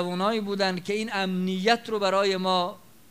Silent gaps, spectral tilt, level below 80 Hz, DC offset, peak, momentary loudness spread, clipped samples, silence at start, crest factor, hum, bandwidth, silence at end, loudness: none; -5 dB/octave; -70 dBFS; 0.2%; -4 dBFS; 4 LU; under 0.1%; 0 s; 22 dB; none; 16 kHz; 0.35 s; -26 LUFS